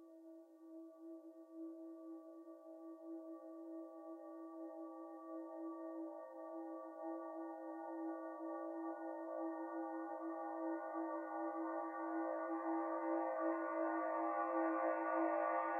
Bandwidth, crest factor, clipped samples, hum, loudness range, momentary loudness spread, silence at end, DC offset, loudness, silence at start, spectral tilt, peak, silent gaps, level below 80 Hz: 2.9 kHz; 18 dB; under 0.1%; none; 13 LU; 17 LU; 0 s; under 0.1%; -45 LUFS; 0 s; -6 dB/octave; -28 dBFS; none; under -90 dBFS